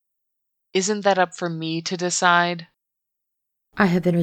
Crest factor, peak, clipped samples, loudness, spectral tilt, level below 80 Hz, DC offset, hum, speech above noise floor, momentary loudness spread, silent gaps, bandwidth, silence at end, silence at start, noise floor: 20 dB; -4 dBFS; under 0.1%; -21 LUFS; -4 dB/octave; -62 dBFS; under 0.1%; none; 61 dB; 10 LU; none; 9.4 kHz; 0 s; 0.75 s; -81 dBFS